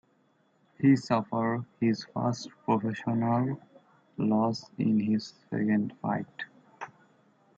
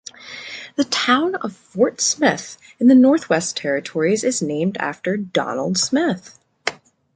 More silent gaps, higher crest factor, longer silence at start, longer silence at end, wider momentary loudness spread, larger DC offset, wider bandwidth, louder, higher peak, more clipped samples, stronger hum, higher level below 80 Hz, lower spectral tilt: neither; about the same, 18 dB vs 18 dB; first, 0.8 s vs 0.2 s; first, 0.7 s vs 0.4 s; about the same, 16 LU vs 15 LU; neither; second, 7.8 kHz vs 9.4 kHz; second, -29 LUFS vs -19 LUFS; second, -12 dBFS vs -2 dBFS; neither; neither; second, -72 dBFS vs -66 dBFS; first, -7.5 dB/octave vs -3.5 dB/octave